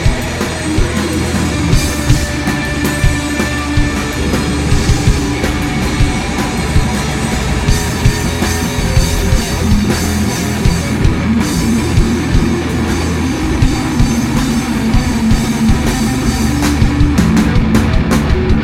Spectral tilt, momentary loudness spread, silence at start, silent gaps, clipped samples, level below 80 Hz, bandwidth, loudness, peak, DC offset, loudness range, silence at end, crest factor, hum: -5 dB/octave; 3 LU; 0 s; none; under 0.1%; -18 dBFS; 16.5 kHz; -14 LUFS; 0 dBFS; under 0.1%; 2 LU; 0 s; 12 dB; none